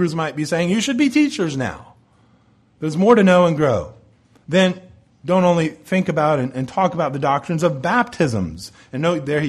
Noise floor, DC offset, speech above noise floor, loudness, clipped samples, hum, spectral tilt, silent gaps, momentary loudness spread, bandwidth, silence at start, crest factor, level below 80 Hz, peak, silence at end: -55 dBFS; under 0.1%; 38 dB; -18 LUFS; under 0.1%; none; -6 dB/octave; none; 13 LU; 12.5 kHz; 0 s; 16 dB; -52 dBFS; -2 dBFS; 0 s